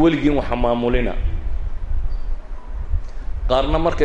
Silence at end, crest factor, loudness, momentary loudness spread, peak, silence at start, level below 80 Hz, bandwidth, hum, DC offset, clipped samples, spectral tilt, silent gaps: 0 s; 16 dB; -22 LUFS; 15 LU; -2 dBFS; 0 s; -22 dBFS; 7.4 kHz; none; under 0.1%; under 0.1%; -7.5 dB/octave; none